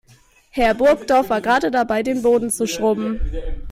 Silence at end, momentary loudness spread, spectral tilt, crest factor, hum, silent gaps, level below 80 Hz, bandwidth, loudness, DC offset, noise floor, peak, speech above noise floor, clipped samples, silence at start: 0 s; 11 LU; -4 dB/octave; 14 dB; none; none; -32 dBFS; 16 kHz; -18 LUFS; under 0.1%; -52 dBFS; -6 dBFS; 34 dB; under 0.1%; 0.55 s